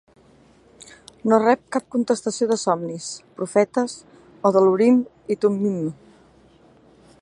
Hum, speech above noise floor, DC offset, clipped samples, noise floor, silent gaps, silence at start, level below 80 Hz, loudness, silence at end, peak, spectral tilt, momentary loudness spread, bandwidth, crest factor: none; 33 dB; under 0.1%; under 0.1%; -53 dBFS; none; 1.25 s; -66 dBFS; -21 LUFS; 1.3 s; -2 dBFS; -5.5 dB/octave; 13 LU; 11 kHz; 20 dB